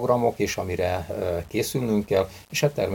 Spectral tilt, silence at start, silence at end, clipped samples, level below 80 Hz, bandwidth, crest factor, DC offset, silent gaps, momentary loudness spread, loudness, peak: -5 dB/octave; 0 s; 0 s; under 0.1%; -48 dBFS; 17 kHz; 18 dB; under 0.1%; none; 5 LU; -25 LUFS; -6 dBFS